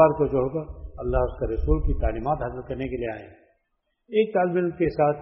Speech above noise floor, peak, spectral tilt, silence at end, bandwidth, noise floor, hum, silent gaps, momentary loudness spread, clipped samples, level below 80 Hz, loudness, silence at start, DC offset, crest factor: 52 dB; -4 dBFS; -7 dB/octave; 0 s; 5.6 kHz; -75 dBFS; none; none; 10 LU; under 0.1%; -32 dBFS; -26 LUFS; 0 s; under 0.1%; 20 dB